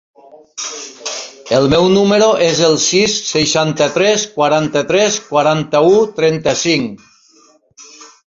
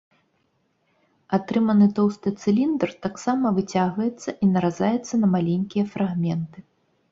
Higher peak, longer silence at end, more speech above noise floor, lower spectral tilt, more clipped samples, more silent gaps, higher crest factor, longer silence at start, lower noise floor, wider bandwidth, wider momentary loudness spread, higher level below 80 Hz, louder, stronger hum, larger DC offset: first, 0 dBFS vs -6 dBFS; second, 0.2 s vs 0.5 s; second, 37 dB vs 47 dB; second, -3.5 dB/octave vs -7.5 dB/octave; neither; neither; about the same, 14 dB vs 16 dB; second, 0.35 s vs 1.3 s; second, -50 dBFS vs -69 dBFS; about the same, 7.8 kHz vs 7.8 kHz; first, 13 LU vs 8 LU; first, -48 dBFS vs -62 dBFS; first, -13 LUFS vs -23 LUFS; neither; neither